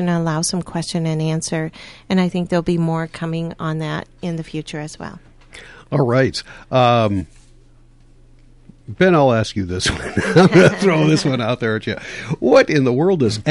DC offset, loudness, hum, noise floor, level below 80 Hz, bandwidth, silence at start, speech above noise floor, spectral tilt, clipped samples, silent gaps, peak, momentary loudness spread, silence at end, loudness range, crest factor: under 0.1%; -17 LUFS; none; -47 dBFS; -44 dBFS; 11.5 kHz; 0 s; 30 dB; -6 dB/octave; under 0.1%; none; -2 dBFS; 14 LU; 0 s; 8 LU; 16 dB